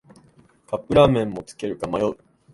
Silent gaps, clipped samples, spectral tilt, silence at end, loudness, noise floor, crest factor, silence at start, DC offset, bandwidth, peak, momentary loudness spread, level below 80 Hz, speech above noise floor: none; under 0.1%; -7 dB/octave; 0.4 s; -22 LUFS; -55 dBFS; 22 dB; 0.7 s; under 0.1%; 11.5 kHz; 0 dBFS; 15 LU; -46 dBFS; 34 dB